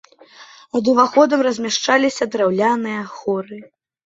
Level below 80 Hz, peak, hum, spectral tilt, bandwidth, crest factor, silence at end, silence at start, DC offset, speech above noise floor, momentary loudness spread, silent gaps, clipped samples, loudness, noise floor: -64 dBFS; -2 dBFS; none; -4 dB/octave; 8 kHz; 18 dB; 0.4 s; 0.4 s; under 0.1%; 27 dB; 11 LU; none; under 0.1%; -18 LUFS; -45 dBFS